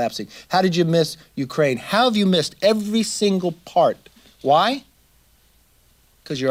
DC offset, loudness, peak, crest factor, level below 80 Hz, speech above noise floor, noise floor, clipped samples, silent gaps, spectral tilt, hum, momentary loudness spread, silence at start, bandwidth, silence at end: under 0.1%; -20 LUFS; -4 dBFS; 16 dB; -60 dBFS; 38 dB; -57 dBFS; under 0.1%; none; -5 dB/octave; none; 11 LU; 0 s; 16.5 kHz; 0 s